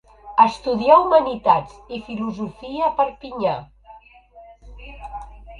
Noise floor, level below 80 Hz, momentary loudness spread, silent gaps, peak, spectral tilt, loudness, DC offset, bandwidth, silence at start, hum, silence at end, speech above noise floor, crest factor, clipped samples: -47 dBFS; -46 dBFS; 21 LU; none; 0 dBFS; -6.5 dB/octave; -19 LUFS; under 0.1%; 10 kHz; 0.25 s; none; 0 s; 28 dB; 20 dB; under 0.1%